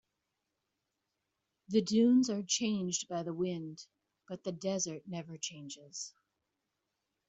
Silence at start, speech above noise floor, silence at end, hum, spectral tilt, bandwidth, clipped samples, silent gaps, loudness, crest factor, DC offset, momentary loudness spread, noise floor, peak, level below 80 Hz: 1.7 s; 52 dB; 1.2 s; none; -4.5 dB/octave; 8.2 kHz; under 0.1%; none; -34 LUFS; 20 dB; under 0.1%; 18 LU; -86 dBFS; -16 dBFS; -78 dBFS